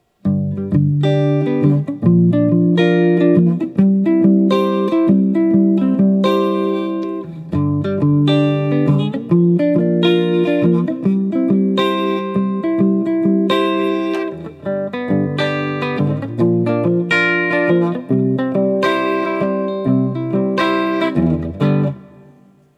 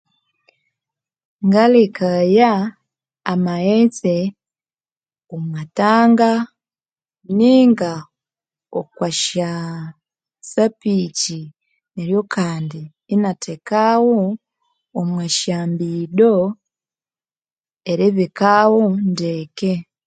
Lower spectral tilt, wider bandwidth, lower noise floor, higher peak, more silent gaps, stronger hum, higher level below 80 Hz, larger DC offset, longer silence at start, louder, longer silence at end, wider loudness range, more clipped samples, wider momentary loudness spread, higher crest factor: first, -8.5 dB/octave vs -5.5 dB/octave; second, 8 kHz vs 9.4 kHz; second, -48 dBFS vs under -90 dBFS; about the same, 0 dBFS vs 0 dBFS; second, none vs 4.92-4.96 s, 17.53-17.57 s; neither; first, -52 dBFS vs -64 dBFS; neither; second, 0.25 s vs 1.4 s; about the same, -16 LUFS vs -17 LUFS; first, 0.7 s vs 0.25 s; about the same, 4 LU vs 5 LU; neither; second, 6 LU vs 16 LU; about the same, 14 dB vs 18 dB